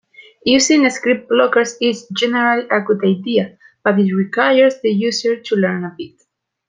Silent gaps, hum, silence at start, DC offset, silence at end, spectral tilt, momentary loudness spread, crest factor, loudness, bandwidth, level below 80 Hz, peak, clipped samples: none; none; 0.2 s; under 0.1%; 0.6 s; -4 dB/octave; 9 LU; 14 dB; -16 LUFS; 9.6 kHz; -62 dBFS; -2 dBFS; under 0.1%